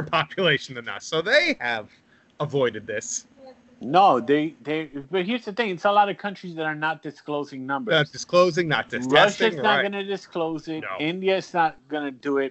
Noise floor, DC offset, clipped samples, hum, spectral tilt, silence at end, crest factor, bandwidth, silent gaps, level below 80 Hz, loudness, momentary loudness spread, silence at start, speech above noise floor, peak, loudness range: -49 dBFS; under 0.1%; under 0.1%; none; -4 dB/octave; 0 s; 20 dB; 8.2 kHz; none; -66 dBFS; -23 LUFS; 13 LU; 0 s; 26 dB; -2 dBFS; 4 LU